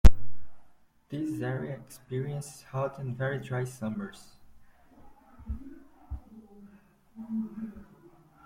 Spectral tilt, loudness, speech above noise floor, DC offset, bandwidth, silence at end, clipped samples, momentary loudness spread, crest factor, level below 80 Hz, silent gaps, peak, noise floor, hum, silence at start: -7 dB/octave; -35 LUFS; 24 dB; under 0.1%; 14 kHz; 0.65 s; under 0.1%; 21 LU; 24 dB; -34 dBFS; none; -4 dBFS; -58 dBFS; none; 0.05 s